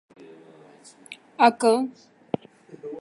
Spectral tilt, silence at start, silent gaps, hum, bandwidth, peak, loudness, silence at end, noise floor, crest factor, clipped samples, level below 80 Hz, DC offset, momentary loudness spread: -4.5 dB/octave; 1.1 s; none; none; 11.5 kHz; -4 dBFS; -23 LUFS; 0 s; -50 dBFS; 22 dB; under 0.1%; -74 dBFS; under 0.1%; 24 LU